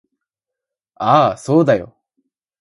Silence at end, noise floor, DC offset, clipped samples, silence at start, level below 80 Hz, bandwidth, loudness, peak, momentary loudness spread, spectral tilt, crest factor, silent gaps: 0.75 s; -84 dBFS; under 0.1%; under 0.1%; 1 s; -56 dBFS; 11.5 kHz; -15 LUFS; 0 dBFS; 6 LU; -7 dB/octave; 18 dB; none